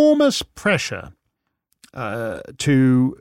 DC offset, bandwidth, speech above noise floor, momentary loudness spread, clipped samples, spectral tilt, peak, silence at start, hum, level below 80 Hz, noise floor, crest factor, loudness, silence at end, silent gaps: under 0.1%; 16 kHz; 57 dB; 15 LU; under 0.1%; -5.5 dB/octave; -6 dBFS; 0 s; none; -52 dBFS; -75 dBFS; 14 dB; -19 LUFS; 0.05 s; none